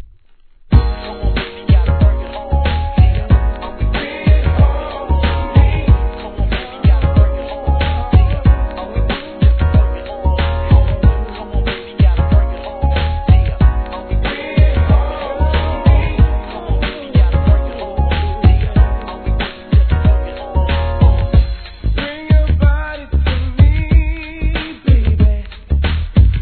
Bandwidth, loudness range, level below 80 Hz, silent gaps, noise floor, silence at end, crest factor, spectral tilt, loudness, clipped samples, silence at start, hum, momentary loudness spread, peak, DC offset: 4.5 kHz; 1 LU; -14 dBFS; none; -44 dBFS; 0 s; 12 dB; -11 dB/octave; -15 LUFS; under 0.1%; 0 s; none; 9 LU; 0 dBFS; 0.3%